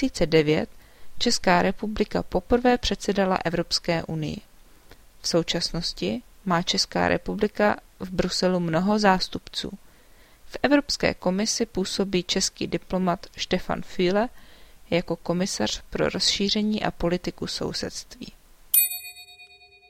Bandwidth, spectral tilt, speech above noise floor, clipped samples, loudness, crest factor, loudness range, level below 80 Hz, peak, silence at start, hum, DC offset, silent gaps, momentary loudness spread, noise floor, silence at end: 16.5 kHz; -4 dB/octave; 28 dB; under 0.1%; -24 LUFS; 22 dB; 3 LU; -44 dBFS; -2 dBFS; 0 s; none; under 0.1%; none; 11 LU; -52 dBFS; 0.45 s